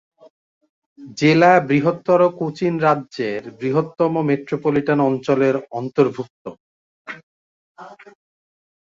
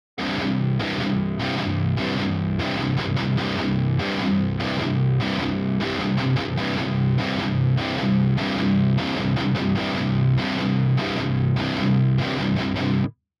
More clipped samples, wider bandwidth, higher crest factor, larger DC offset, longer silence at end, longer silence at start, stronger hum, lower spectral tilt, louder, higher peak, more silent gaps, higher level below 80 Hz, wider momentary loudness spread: neither; about the same, 7.6 kHz vs 7.2 kHz; first, 18 dB vs 12 dB; neither; first, 0.9 s vs 0.3 s; first, 1 s vs 0.15 s; neither; about the same, -7 dB/octave vs -7.5 dB/octave; first, -18 LUFS vs -23 LUFS; first, -2 dBFS vs -10 dBFS; first, 6.30-6.45 s, 6.60-7.05 s, 7.23-7.75 s vs none; second, -62 dBFS vs -44 dBFS; first, 22 LU vs 3 LU